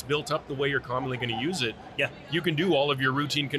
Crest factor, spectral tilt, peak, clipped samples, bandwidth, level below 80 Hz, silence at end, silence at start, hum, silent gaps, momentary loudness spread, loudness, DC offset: 16 dB; -5 dB/octave; -12 dBFS; under 0.1%; 13.5 kHz; -58 dBFS; 0 s; 0 s; none; none; 6 LU; -27 LUFS; under 0.1%